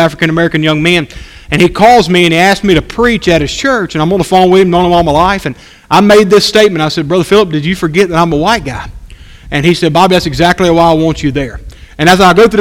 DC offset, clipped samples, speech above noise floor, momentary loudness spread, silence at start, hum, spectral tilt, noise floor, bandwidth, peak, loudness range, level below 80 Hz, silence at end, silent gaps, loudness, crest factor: under 0.1%; 2%; 23 dB; 9 LU; 0 s; none; -5.5 dB/octave; -31 dBFS; 16.5 kHz; 0 dBFS; 3 LU; -30 dBFS; 0 s; none; -8 LUFS; 8 dB